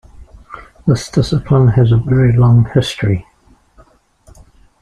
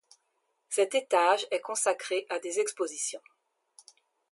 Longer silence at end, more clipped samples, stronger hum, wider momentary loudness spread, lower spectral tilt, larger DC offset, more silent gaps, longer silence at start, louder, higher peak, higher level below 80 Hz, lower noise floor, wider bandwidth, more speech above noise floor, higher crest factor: first, 1.6 s vs 1.15 s; neither; neither; first, 12 LU vs 9 LU; first, -7.5 dB/octave vs 0 dB/octave; neither; neither; second, 0.2 s vs 0.7 s; first, -13 LUFS vs -29 LUFS; first, 0 dBFS vs -10 dBFS; first, -36 dBFS vs under -90 dBFS; second, -48 dBFS vs -77 dBFS; about the same, 11 kHz vs 12 kHz; second, 37 dB vs 48 dB; second, 14 dB vs 20 dB